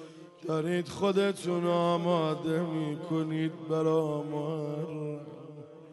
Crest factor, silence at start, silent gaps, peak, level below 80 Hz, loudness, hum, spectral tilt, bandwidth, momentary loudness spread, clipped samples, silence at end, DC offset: 16 dB; 0 s; none; -14 dBFS; -74 dBFS; -31 LUFS; none; -7 dB/octave; 11.5 kHz; 15 LU; under 0.1%; 0 s; under 0.1%